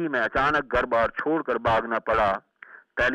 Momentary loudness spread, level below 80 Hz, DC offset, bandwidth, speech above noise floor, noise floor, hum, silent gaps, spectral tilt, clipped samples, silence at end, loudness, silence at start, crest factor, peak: 4 LU; -46 dBFS; under 0.1%; 9.8 kHz; 26 dB; -50 dBFS; none; none; -6 dB/octave; under 0.1%; 0 s; -24 LUFS; 0 s; 14 dB; -12 dBFS